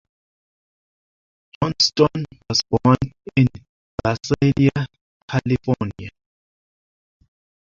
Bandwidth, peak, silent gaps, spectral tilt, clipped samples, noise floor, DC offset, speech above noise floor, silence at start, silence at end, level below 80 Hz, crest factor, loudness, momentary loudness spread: 7.4 kHz; -2 dBFS; 3.69-3.98 s, 5.01-5.28 s; -5.5 dB/octave; under 0.1%; under -90 dBFS; under 0.1%; over 71 dB; 1.6 s; 1.65 s; -46 dBFS; 22 dB; -20 LUFS; 13 LU